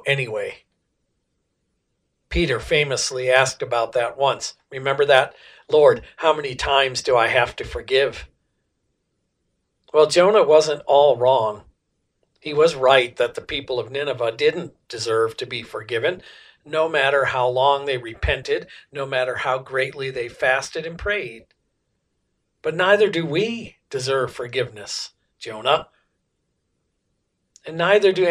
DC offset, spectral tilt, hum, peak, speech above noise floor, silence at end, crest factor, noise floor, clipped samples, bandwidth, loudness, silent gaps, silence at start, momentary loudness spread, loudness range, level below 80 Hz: under 0.1%; -3.5 dB/octave; none; 0 dBFS; 53 dB; 0 s; 22 dB; -73 dBFS; under 0.1%; 11.5 kHz; -20 LUFS; none; 0.05 s; 14 LU; 7 LU; -44 dBFS